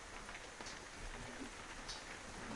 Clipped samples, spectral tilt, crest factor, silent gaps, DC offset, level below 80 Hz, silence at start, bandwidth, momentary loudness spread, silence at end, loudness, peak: under 0.1%; -2.5 dB/octave; 16 dB; none; under 0.1%; -58 dBFS; 0 s; 11.5 kHz; 2 LU; 0 s; -49 LUFS; -34 dBFS